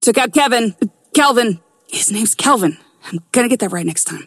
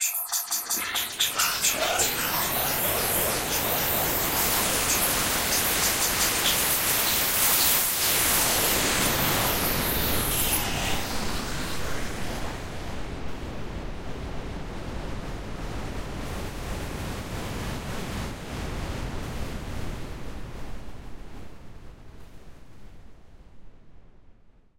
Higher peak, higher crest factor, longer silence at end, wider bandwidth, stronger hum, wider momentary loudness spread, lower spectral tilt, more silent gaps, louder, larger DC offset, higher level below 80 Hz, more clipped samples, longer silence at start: first, 0 dBFS vs -8 dBFS; about the same, 16 dB vs 20 dB; second, 0.05 s vs 0.7 s; about the same, 16 kHz vs 16 kHz; neither; second, 12 LU vs 16 LU; about the same, -3 dB/octave vs -2 dB/octave; neither; first, -15 LUFS vs -24 LUFS; neither; second, -64 dBFS vs -40 dBFS; neither; about the same, 0 s vs 0 s